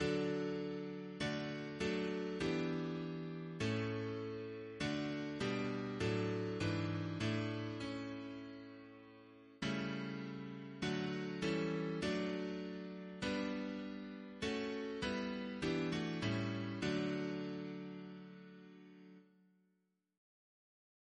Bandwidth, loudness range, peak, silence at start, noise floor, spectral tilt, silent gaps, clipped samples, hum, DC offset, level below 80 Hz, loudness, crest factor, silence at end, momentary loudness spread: 10.5 kHz; 5 LU; -26 dBFS; 0 s; -82 dBFS; -6 dB/octave; none; under 0.1%; none; under 0.1%; -66 dBFS; -41 LUFS; 16 dB; 1.95 s; 13 LU